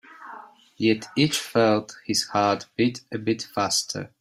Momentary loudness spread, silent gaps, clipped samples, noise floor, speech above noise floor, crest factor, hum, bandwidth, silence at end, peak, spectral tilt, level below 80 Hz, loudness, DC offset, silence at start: 14 LU; none; under 0.1%; -45 dBFS; 21 dB; 18 dB; none; 16 kHz; 0.15 s; -6 dBFS; -4 dB/octave; -64 dBFS; -24 LUFS; under 0.1%; 0.1 s